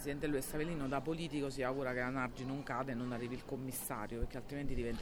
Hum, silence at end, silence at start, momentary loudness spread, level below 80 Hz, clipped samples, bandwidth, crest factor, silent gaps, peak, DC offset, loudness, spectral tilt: none; 0 s; 0 s; 5 LU; -50 dBFS; under 0.1%; 18.5 kHz; 16 dB; none; -24 dBFS; under 0.1%; -40 LUFS; -5.5 dB/octave